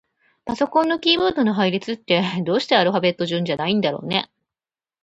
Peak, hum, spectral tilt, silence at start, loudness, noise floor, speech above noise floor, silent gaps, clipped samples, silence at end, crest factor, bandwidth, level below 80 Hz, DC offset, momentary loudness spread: -2 dBFS; none; -6 dB/octave; 0.45 s; -20 LUFS; under -90 dBFS; over 70 dB; none; under 0.1%; 0.8 s; 18 dB; 8.2 kHz; -60 dBFS; under 0.1%; 7 LU